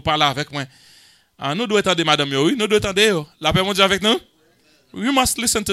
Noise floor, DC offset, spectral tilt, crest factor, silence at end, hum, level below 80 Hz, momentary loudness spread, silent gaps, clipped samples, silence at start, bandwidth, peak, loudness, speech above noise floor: -57 dBFS; under 0.1%; -3 dB/octave; 20 dB; 0 s; none; -44 dBFS; 11 LU; none; under 0.1%; 0.05 s; 16 kHz; 0 dBFS; -18 LUFS; 38 dB